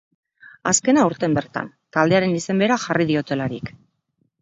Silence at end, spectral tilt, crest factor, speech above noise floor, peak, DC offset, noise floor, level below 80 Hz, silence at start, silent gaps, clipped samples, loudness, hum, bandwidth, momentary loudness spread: 0.7 s; -4.5 dB/octave; 18 dB; 49 dB; -2 dBFS; under 0.1%; -69 dBFS; -56 dBFS; 0.65 s; none; under 0.1%; -20 LUFS; none; 8.2 kHz; 12 LU